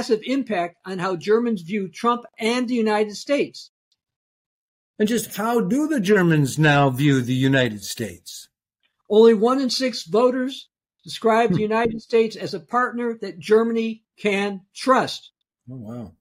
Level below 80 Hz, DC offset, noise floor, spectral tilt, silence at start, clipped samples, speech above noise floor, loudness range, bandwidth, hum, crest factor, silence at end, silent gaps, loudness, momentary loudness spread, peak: -60 dBFS; under 0.1%; -73 dBFS; -5.5 dB/octave; 0 s; under 0.1%; 53 dB; 5 LU; 16 kHz; none; 18 dB; 0.1 s; 3.69-3.91 s, 4.16-4.94 s; -21 LUFS; 14 LU; -4 dBFS